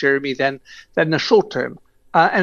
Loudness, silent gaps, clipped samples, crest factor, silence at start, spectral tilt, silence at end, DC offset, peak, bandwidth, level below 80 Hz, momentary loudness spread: -19 LUFS; none; under 0.1%; 18 dB; 0 s; -5.5 dB/octave; 0 s; under 0.1%; -2 dBFS; 7.2 kHz; -58 dBFS; 11 LU